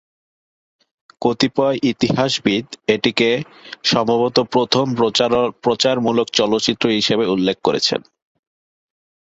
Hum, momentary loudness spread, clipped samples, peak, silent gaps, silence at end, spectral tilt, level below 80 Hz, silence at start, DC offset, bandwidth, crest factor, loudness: none; 4 LU; under 0.1%; -2 dBFS; none; 1.25 s; -4.5 dB/octave; -56 dBFS; 1.2 s; under 0.1%; 8 kHz; 18 dB; -17 LUFS